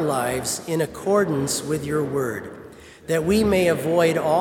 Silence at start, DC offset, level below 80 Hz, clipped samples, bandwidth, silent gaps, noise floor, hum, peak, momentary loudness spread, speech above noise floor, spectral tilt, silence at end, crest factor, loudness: 0 s; under 0.1%; -50 dBFS; under 0.1%; 18 kHz; none; -43 dBFS; none; -6 dBFS; 10 LU; 21 dB; -5 dB/octave; 0 s; 16 dB; -22 LUFS